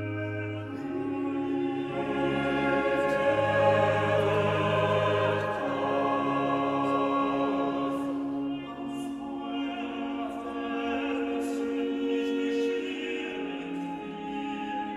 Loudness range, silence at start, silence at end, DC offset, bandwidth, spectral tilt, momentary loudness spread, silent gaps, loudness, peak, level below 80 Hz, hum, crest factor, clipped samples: 7 LU; 0 s; 0 s; under 0.1%; 12 kHz; -6.5 dB/octave; 10 LU; none; -29 LUFS; -12 dBFS; -60 dBFS; none; 16 dB; under 0.1%